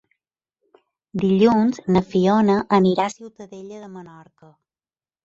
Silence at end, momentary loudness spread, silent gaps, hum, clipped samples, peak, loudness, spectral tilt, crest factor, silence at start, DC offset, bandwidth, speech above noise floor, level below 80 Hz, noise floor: 1.2 s; 22 LU; none; none; under 0.1%; -4 dBFS; -18 LUFS; -7.5 dB/octave; 18 dB; 1.15 s; under 0.1%; 7.8 kHz; over 70 dB; -56 dBFS; under -90 dBFS